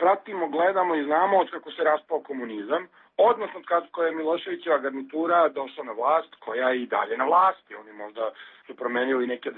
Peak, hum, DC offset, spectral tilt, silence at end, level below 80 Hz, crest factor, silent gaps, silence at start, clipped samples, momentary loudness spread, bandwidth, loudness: -8 dBFS; none; under 0.1%; -8 dB/octave; 0 s; -82 dBFS; 16 dB; none; 0 s; under 0.1%; 12 LU; 4.3 kHz; -25 LUFS